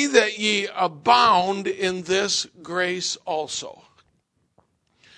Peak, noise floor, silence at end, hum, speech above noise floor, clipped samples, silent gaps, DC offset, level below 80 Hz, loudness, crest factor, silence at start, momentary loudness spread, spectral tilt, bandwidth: -2 dBFS; -69 dBFS; 1.45 s; none; 47 dB; under 0.1%; none; under 0.1%; -64 dBFS; -22 LUFS; 22 dB; 0 s; 11 LU; -2.5 dB/octave; 10.5 kHz